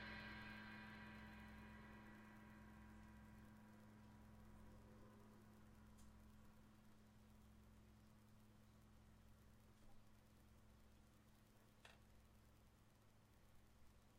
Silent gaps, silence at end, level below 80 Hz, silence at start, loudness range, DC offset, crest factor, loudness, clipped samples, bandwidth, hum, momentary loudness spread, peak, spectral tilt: none; 0 s; -72 dBFS; 0 s; 9 LU; under 0.1%; 20 dB; -63 LUFS; under 0.1%; 15.5 kHz; none; 12 LU; -44 dBFS; -5 dB/octave